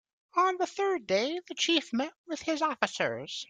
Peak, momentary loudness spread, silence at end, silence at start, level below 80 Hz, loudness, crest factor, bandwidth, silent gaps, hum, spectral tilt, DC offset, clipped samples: -8 dBFS; 7 LU; 0.05 s; 0.35 s; -74 dBFS; -30 LUFS; 22 dB; 9.4 kHz; 2.18-2.24 s; none; -2.5 dB/octave; under 0.1%; under 0.1%